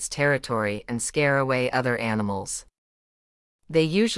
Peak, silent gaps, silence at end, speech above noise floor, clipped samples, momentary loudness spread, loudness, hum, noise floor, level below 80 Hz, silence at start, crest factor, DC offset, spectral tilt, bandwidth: -8 dBFS; 2.78-3.59 s; 0 s; over 66 dB; under 0.1%; 7 LU; -25 LUFS; none; under -90 dBFS; -54 dBFS; 0 s; 16 dB; under 0.1%; -4.5 dB/octave; 12 kHz